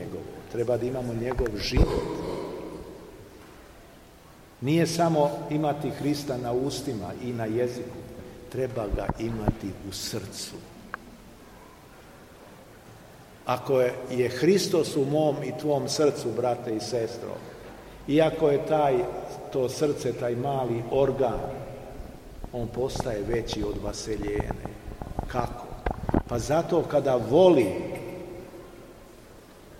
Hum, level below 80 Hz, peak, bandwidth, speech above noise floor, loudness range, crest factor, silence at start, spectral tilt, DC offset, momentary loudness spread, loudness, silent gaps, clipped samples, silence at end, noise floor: none; -42 dBFS; -6 dBFS; 16.5 kHz; 25 dB; 8 LU; 22 dB; 0 s; -6 dB/octave; under 0.1%; 18 LU; -27 LUFS; none; under 0.1%; 0 s; -51 dBFS